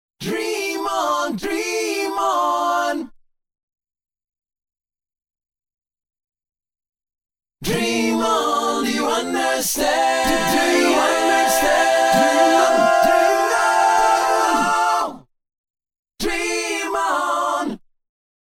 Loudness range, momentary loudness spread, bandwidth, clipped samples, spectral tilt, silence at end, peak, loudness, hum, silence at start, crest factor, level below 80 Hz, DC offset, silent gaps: 10 LU; 9 LU; 18.5 kHz; under 0.1%; -2.5 dB/octave; 0.7 s; -4 dBFS; -18 LUFS; none; 0.2 s; 16 dB; -48 dBFS; under 0.1%; 3.63-3.68 s, 15.58-15.64 s, 15.70-15.74 s, 15.99-16.03 s